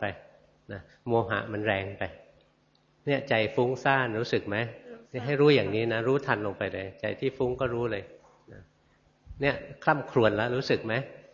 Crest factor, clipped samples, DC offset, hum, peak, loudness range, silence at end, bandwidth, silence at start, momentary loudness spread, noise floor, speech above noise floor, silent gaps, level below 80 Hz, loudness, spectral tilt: 22 dB; under 0.1%; under 0.1%; none; -6 dBFS; 6 LU; 0.15 s; 7.4 kHz; 0 s; 13 LU; -66 dBFS; 38 dB; none; -58 dBFS; -28 LUFS; -7 dB/octave